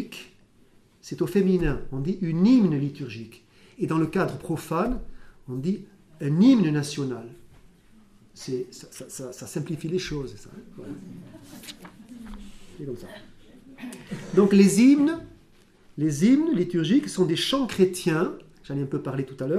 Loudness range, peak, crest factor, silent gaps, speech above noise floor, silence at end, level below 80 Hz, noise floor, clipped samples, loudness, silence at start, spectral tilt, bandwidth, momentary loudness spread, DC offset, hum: 14 LU; -6 dBFS; 20 dB; none; 33 dB; 0 s; -46 dBFS; -57 dBFS; under 0.1%; -24 LUFS; 0 s; -6 dB/octave; 14 kHz; 24 LU; under 0.1%; none